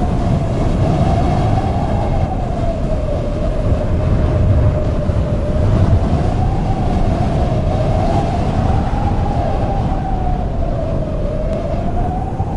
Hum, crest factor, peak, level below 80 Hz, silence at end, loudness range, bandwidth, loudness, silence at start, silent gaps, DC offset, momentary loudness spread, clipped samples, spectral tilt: none; 12 dB; -2 dBFS; -20 dBFS; 0 s; 3 LU; 10.5 kHz; -17 LUFS; 0 s; none; under 0.1%; 5 LU; under 0.1%; -8.5 dB/octave